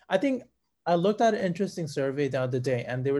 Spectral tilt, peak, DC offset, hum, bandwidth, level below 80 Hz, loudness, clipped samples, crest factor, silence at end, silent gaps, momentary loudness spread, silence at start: -6.5 dB/octave; -8 dBFS; under 0.1%; none; 12 kHz; -68 dBFS; -28 LUFS; under 0.1%; 18 dB; 0 s; none; 7 LU; 0.1 s